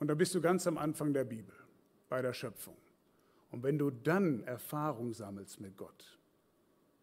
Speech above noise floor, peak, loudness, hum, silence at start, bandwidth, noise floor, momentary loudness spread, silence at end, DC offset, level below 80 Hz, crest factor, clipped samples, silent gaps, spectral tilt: 36 dB; -18 dBFS; -36 LUFS; none; 0 s; 16 kHz; -72 dBFS; 18 LU; 0.9 s; under 0.1%; -78 dBFS; 20 dB; under 0.1%; none; -6 dB/octave